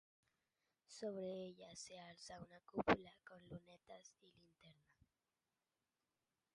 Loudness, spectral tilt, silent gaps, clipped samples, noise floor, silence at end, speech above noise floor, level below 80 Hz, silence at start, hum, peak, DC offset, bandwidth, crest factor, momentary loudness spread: -47 LUFS; -4.5 dB/octave; none; under 0.1%; under -90 dBFS; 1.8 s; over 41 dB; -74 dBFS; 0.9 s; none; -22 dBFS; under 0.1%; 11 kHz; 30 dB; 22 LU